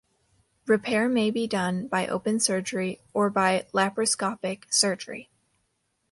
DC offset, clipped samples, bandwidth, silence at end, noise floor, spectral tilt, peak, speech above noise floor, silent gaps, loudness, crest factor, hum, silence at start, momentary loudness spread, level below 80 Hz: under 0.1%; under 0.1%; 11.5 kHz; 0.9 s; -75 dBFS; -3.5 dB/octave; -6 dBFS; 49 dB; none; -25 LUFS; 20 dB; none; 0.65 s; 9 LU; -68 dBFS